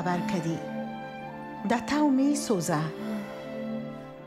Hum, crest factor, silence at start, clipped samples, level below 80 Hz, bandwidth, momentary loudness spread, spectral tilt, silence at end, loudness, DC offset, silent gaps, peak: none; 18 dB; 0 s; under 0.1%; -62 dBFS; 15 kHz; 14 LU; -5.5 dB/octave; 0 s; -30 LUFS; under 0.1%; none; -12 dBFS